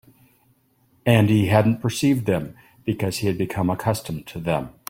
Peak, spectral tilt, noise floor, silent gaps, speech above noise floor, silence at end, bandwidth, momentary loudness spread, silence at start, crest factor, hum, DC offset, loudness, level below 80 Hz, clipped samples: -2 dBFS; -6.5 dB/octave; -62 dBFS; none; 41 dB; 0.2 s; 16.5 kHz; 12 LU; 1.05 s; 20 dB; none; under 0.1%; -22 LUFS; -52 dBFS; under 0.1%